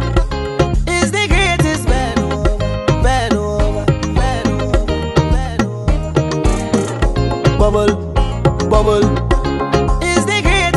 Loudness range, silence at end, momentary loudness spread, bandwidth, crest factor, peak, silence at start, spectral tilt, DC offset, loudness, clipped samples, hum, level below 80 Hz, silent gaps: 2 LU; 0 s; 5 LU; 12 kHz; 14 dB; 0 dBFS; 0 s; -5.5 dB/octave; under 0.1%; -15 LUFS; under 0.1%; none; -18 dBFS; none